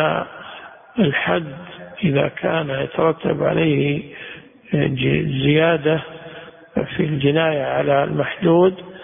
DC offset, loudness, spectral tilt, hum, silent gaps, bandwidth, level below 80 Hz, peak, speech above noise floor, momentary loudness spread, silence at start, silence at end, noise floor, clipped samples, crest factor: under 0.1%; -19 LUFS; -12 dB/octave; none; none; 3.7 kHz; -50 dBFS; -4 dBFS; 20 dB; 19 LU; 0 s; 0 s; -39 dBFS; under 0.1%; 16 dB